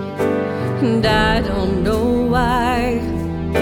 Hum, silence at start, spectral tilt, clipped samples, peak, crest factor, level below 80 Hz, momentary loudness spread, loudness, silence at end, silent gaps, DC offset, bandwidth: none; 0 s; -6.5 dB/octave; under 0.1%; -2 dBFS; 14 dB; -30 dBFS; 6 LU; -18 LUFS; 0 s; none; under 0.1%; 18 kHz